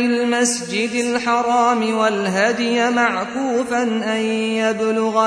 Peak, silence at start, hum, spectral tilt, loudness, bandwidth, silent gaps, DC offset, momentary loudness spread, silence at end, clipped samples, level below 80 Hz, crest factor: -2 dBFS; 0 s; none; -3.5 dB/octave; -18 LUFS; 11 kHz; none; under 0.1%; 4 LU; 0 s; under 0.1%; -60 dBFS; 16 dB